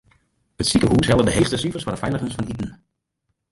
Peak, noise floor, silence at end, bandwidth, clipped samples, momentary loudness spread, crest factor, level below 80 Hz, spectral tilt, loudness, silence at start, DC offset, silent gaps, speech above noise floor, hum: -4 dBFS; -75 dBFS; 0.75 s; 11.5 kHz; under 0.1%; 12 LU; 18 dB; -38 dBFS; -5 dB/octave; -20 LUFS; 0.6 s; under 0.1%; none; 56 dB; none